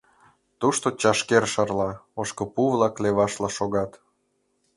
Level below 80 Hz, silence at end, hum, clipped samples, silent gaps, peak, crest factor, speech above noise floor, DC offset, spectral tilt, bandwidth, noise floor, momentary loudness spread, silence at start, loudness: -56 dBFS; 0.85 s; none; under 0.1%; none; -2 dBFS; 22 dB; 48 dB; under 0.1%; -4 dB/octave; 11.5 kHz; -71 dBFS; 9 LU; 0.6 s; -24 LUFS